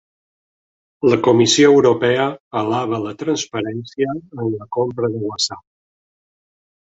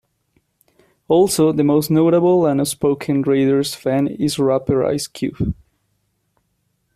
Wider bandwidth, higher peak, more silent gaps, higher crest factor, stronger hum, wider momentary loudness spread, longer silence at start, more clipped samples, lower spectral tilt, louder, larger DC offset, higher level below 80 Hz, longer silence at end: second, 8 kHz vs 15 kHz; about the same, -2 dBFS vs -4 dBFS; first, 2.40-2.51 s vs none; about the same, 18 dB vs 14 dB; neither; first, 13 LU vs 9 LU; about the same, 1 s vs 1.1 s; neither; second, -4.5 dB/octave vs -6 dB/octave; about the same, -18 LUFS vs -17 LUFS; neither; second, -58 dBFS vs -46 dBFS; second, 1.25 s vs 1.45 s